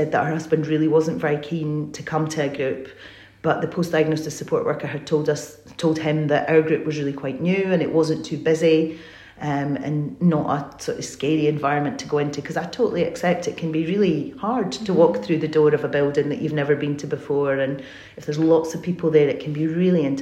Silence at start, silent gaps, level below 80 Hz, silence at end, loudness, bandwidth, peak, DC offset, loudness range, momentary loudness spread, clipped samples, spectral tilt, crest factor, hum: 0 s; none; -60 dBFS; 0 s; -22 LUFS; 13 kHz; -4 dBFS; under 0.1%; 3 LU; 9 LU; under 0.1%; -6.5 dB/octave; 18 dB; none